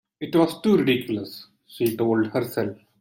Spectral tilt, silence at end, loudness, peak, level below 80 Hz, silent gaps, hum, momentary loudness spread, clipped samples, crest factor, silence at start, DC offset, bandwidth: -6.5 dB/octave; 0.25 s; -23 LUFS; -6 dBFS; -64 dBFS; none; none; 11 LU; under 0.1%; 16 dB; 0.2 s; under 0.1%; 17 kHz